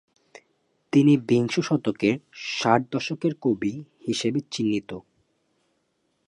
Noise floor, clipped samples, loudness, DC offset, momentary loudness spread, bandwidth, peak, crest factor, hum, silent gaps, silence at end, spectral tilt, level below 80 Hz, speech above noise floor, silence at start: -72 dBFS; under 0.1%; -24 LUFS; under 0.1%; 11 LU; 11 kHz; -4 dBFS; 20 dB; none; none; 1.3 s; -6 dB/octave; -66 dBFS; 49 dB; 0.95 s